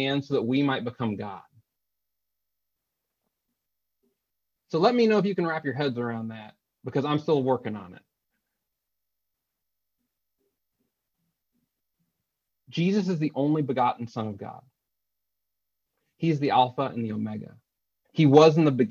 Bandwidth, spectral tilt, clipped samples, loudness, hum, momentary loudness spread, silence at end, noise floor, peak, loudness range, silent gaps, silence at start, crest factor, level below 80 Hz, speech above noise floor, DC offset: 7.2 kHz; -7.5 dB/octave; under 0.1%; -25 LUFS; 50 Hz at -60 dBFS; 17 LU; 0 s; -85 dBFS; -4 dBFS; 9 LU; none; 0 s; 24 dB; -70 dBFS; 61 dB; under 0.1%